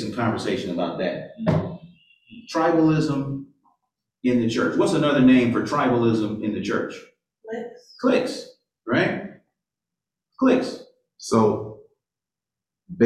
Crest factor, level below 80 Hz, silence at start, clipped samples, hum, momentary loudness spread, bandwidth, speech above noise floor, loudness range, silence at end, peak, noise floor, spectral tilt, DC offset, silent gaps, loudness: 18 dB; -56 dBFS; 0 s; under 0.1%; none; 17 LU; 11 kHz; 68 dB; 6 LU; 0 s; -6 dBFS; -89 dBFS; -6.5 dB/octave; under 0.1%; none; -22 LUFS